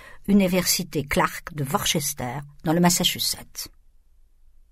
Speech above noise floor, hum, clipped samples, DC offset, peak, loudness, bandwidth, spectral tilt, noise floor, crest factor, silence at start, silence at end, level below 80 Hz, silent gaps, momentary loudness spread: 31 dB; none; under 0.1%; under 0.1%; -6 dBFS; -23 LUFS; 16 kHz; -3.5 dB/octave; -54 dBFS; 18 dB; 0 s; 1.05 s; -46 dBFS; none; 13 LU